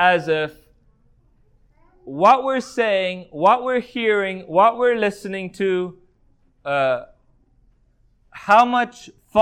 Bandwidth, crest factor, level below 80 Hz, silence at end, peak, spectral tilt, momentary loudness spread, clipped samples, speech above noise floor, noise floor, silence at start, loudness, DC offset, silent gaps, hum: 13 kHz; 18 dB; -60 dBFS; 0 s; -2 dBFS; -5 dB/octave; 14 LU; under 0.1%; 40 dB; -59 dBFS; 0 s; -19 LUFS; under 0.1%; none; none